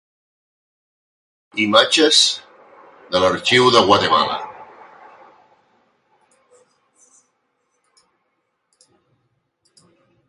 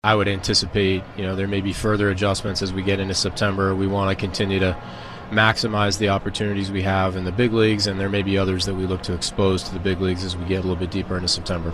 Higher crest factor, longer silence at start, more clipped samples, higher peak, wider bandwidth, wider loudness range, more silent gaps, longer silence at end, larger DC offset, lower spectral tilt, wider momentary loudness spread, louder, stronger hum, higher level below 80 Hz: about the same, 22 dB vs 20 dB; first, 1.55 s vs 0.05 s; neither; about the same, 0 dBFS vs -2 dBFS; second, 11.5 kHz vs 13 kHz; first, 8 LU vs 2 LU; neither; first, 5.65 s vs 0 s; neither; second, -2.5 dB/octave vs -5 dB/octave; first, 16 LU vs 7 LU; first, -15 LUFS vs -22 LUFS; neither; second, -56 dBFS vs -40 dBFS